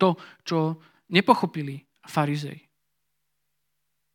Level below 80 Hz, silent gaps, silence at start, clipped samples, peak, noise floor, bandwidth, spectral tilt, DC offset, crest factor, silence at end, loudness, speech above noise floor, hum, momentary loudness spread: -78 dBFS; none; 0 s; under 0.1%; -2 dBFS; -80 dBFS; 17 kHz; -6.5 dB/octave; under 0.1%; 26 dB; 1.55 s; -25 LUFS; 55 dB; none; 17 LU